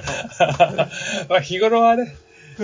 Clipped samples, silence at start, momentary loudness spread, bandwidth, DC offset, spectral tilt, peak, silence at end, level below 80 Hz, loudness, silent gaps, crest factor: under 0.1%; 0 s; 10 LU; 7.6 kHz; under 0.1%; -4.5 dB/octave; -2 dBFS; 0 s; -50 dBFS; -18 LUFS; none; 18 dB